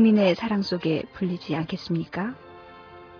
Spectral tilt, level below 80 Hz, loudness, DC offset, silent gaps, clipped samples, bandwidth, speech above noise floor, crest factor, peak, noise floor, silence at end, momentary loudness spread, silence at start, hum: -7.5 dB/octave; -60 dBFS; -26 LUFS; under 0.1%; none; under 0.1%; 5.4 kHz; 22 dB; 18 dB; -8 dBFS; -46 dBFS; 0 s; 24 LU; 0 s; none